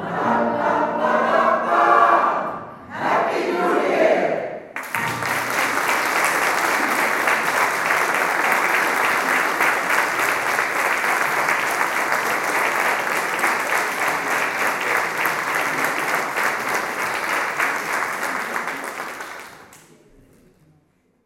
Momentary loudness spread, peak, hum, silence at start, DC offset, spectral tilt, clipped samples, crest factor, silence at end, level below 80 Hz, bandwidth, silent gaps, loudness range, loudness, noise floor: 7 LU; -2 dBFS; none; 0 s; under 0.1%; -2.5 dB/octave; under 0.1%; 18 dB; 1.5 s; -64 dBFS; 16.5 kHz; none; 5 LU; -19 LUFS; -61 dBFS